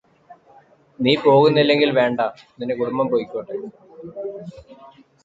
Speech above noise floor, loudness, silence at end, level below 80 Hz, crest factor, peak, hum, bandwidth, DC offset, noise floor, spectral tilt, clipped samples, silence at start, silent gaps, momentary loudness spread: 33 dB; -18 LUFS; 0.4 s; -62 dBFS; 18 dB; -2 dBFS; none; 7.6 kHz; under 0.1%; -52 dBFS; -7.5 dB/octave; under 0.1%; 0.3 s; none; 23 LU